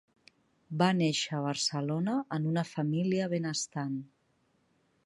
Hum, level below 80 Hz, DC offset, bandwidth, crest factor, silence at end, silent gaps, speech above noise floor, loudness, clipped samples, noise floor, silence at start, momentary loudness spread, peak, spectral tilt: none; -76 dBFS; under 0.1%; 11.5 kHz; 20 dB; 1 s; none; 42 dB; -31 LUFS; under 0.1%; -72 dBFS; 0.7 s; 8 LU; -12 dBFS; -5 dB/octave